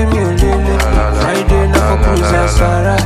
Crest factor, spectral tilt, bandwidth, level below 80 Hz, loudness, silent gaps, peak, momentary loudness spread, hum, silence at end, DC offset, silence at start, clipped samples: 10 dB; -6 dB/octave; 14.5 kHz; -14 dBFS; -12 LUFS; none; 0 dBFS; 2 LU; none; 0 s; under 0.1%; 0 s; under 0.1%